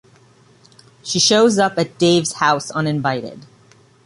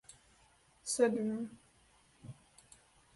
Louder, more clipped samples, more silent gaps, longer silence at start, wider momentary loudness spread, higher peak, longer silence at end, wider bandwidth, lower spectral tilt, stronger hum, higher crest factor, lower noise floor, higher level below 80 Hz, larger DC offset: first, -16 LUFS vs -35 LUFS; neither; neither; first, 1.05 s vs 0.85 s; second, 12 LU vs 26 LU; first, -2 dBFS vs -18 dBFS; second, 0.65 s vs 0.85 s; about the same, 11.5 kHz vs 11.5 kHz; about the same, -3.5 dB/octave vs -4 dB/octave; neither; about the same, 18 dB vs 22 dB; second, -51 dBFS vs -68 dBFS; first, -58 dBFS vs -74 dBFS; neither